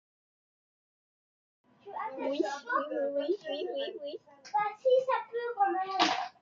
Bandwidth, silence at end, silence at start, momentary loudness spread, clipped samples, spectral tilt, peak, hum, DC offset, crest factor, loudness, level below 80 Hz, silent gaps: 7.6 kHz; 0.1 s; 1.85 s; 12 LU; under 0.1%; -2.5 dB/octave; -12 dBFS; none; under 0.1%; 22 dB; -32 LUFS; -86 dBFS; none